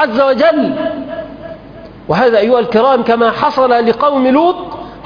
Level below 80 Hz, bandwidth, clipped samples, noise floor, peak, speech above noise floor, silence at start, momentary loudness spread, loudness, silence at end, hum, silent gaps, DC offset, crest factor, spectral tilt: -46 dBFS; 5.2 kHz; under 0.1%; -33 dBFS; 0 dBFS; 22 dB; 0 s; 17 LU; -11 LUFS; 0 s; none; none; under 0.1%; 12 dB; -7 dB/octave